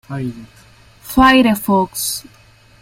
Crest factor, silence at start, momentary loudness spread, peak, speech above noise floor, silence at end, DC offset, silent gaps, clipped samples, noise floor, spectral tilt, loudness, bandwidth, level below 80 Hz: 16 dB; 0.1 s; 16 LU; 0 dBFS; 21 dB; 0.6 s; under 0.1%; none; under 0.1%; -36 dBFS; -4 dB/octave; -15 LUFS; 16.5 kHz; -36 dBFS